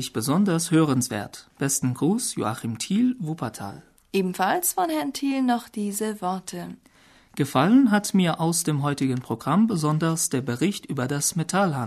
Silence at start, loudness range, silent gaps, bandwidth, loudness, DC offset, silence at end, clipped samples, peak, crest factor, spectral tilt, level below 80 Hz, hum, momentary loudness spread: 0 s; 4 LU; none; 13.5 kHz; -24 LUFS; under 0.1%; 0 s; under 0.1%; -6 dBFS; 18 dB; -5 dB/octave; -62 dBFS; none; 10 LU